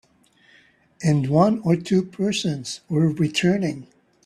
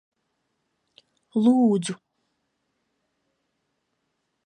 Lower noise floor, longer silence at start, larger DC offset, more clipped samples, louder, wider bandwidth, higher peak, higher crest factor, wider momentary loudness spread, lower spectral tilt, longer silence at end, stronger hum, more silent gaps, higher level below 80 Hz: second, -58 dBFS vs -77 dBFS; second, 1 s vs 1.35 s; neither; neither; about the same, -22 LUFS vs -22 LUFS; first, 12 kHz vs 10 kHz; first, -2 dBFS vs -10 dBFS; about the same, 20 dB vs 18 dB; second, 8 LU vs 15 LU; about the same, -6 dB/octave vs -6.5 dB/octave; second, 0.4 s vs 2.5 s; neither; neither; first, -58 dBFS vs -80 dBFS